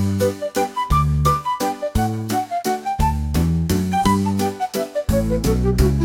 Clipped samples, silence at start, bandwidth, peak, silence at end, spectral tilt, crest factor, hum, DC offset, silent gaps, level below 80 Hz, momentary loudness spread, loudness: under 0.1%; 0 s; 17 kHz; -2 dBFS; 0 s; -6.5 dB/octave; 16 dB; none; under 0.1%; none; -28 dBFS; 5 LU; -20 LUFS